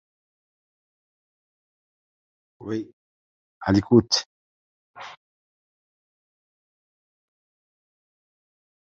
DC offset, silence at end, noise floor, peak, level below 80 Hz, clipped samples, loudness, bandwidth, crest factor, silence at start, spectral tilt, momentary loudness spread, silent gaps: under 0.1%; 3.8 s; under -90 dBFS; -4 dBFS; -56 dBFS; under 0.1%; -22 LUFS; 7.4 kHz; 26 dB; 2.6 s; -5 dB/octave; 24 LU; 2.93-3.61 s, 4.26-4.94 s